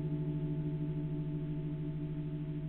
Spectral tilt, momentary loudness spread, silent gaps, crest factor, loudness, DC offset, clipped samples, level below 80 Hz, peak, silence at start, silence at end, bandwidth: -12 dB/octave; 3 LU; none; 10 dB; -38 LUFS; under 0.1%; under 0.1%; -52 dBFS; -28 dBFS; 0 s; 0 s; 3.8 kHz